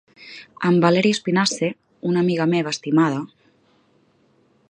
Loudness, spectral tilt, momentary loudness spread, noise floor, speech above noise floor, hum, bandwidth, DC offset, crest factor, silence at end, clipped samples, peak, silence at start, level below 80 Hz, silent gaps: -20 LUFS; -5.5 dB/octave; 20 LU; -60 dBFS; 41 dB; none; 10.5 kHz; under 0.1%; 20 dB; 1.45 s; under 0.1%; -2 dBFS; 0.2 s; -66 dBFS; none